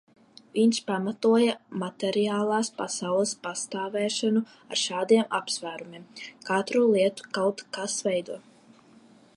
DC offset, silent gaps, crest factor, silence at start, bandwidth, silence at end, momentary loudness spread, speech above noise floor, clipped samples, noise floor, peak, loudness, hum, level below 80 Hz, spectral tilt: under 0.1%; none; 18 dB; 0.55 s; 11.5 kHz; 0.95 s; 12 LU; 29 dB; under 0.1%; -55 dBFS; -8 dBFS; -26 LUFS; none; -78 dBFS; -4 dB/octave